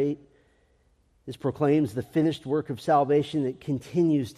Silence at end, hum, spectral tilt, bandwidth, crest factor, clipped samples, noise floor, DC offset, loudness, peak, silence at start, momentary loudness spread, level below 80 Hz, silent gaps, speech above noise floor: 0.05 s; none; -8 dB/octave; 13.5 kHz; 16 dB; under 0.1%; -65 dBFS; under 0.1%; -26 LUFS; -10 dBFS; 0 s; 10 LU; -64 dBFS; none; 40 dB